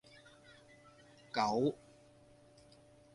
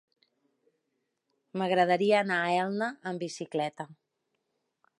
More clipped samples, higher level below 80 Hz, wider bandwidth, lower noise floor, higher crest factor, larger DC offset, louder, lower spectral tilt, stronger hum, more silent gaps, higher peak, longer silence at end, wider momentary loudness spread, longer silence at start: neither; first, -74 dBFS vs -84 dBFS; about the same, 11.5 kHz vs 11.5 kHz; second, -63 dBFS vs -81 dBFS; about the same, 24 dB vs 20 dB; neither; second, -36 LUFS vs -29 LUFS; about the same, -5.5 dB/octave vs -5 dB/octave; neither; neither; second, -18 dBFS vs -12 dBFS; first, 1.4 s vs 1.05 s; first, 27 LU vs 13 LU; second, 1.35 s vs 1.55 s